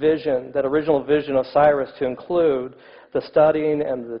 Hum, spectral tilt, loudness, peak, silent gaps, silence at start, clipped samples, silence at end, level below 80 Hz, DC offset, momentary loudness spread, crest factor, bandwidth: none; -9.5 dB/octave; -20 LUFS; -6 dBFS; none; 0 s; under 0.1%; 0 s; -54 dBFS; under 0.1%; 10 LU; 14 dB; 5.4 kHz